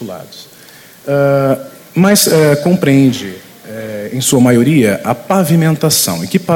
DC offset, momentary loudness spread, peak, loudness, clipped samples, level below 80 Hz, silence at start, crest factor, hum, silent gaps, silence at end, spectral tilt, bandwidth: under 0.1%; 18 LU; 0 dBFS; -11 LUFS; under 0.1%; -50 dBFS; 0 s; 12 dB; none; none; 0 s; -5 dB/octave; 18 kHz